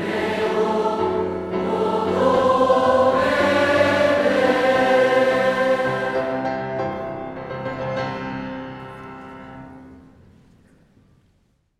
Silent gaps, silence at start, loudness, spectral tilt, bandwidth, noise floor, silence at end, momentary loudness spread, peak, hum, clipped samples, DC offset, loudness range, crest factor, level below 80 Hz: none; 0 s; -20 LUFS; -5.5 dB/octave; 12.5 kHz; -63 dBFS; 1.8 s; 17 LU; -4 dBFS; none; under 0.1%; under 0.1%; 15 LU; 16 dB; -52 dBFS